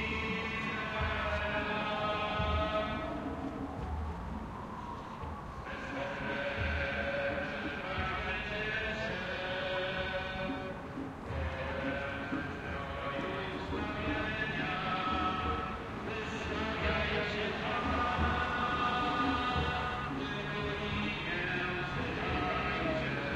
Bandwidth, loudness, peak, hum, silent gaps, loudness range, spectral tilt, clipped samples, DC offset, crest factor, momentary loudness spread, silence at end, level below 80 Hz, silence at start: 11.5 kHz; -35 LUFS; -20 dBFS; none; none; 5 LU; -6 dB/octave; under 0.1%; under 0.1%; 16 dB; 8 LU; 0 s; -48 dBFS; 0 s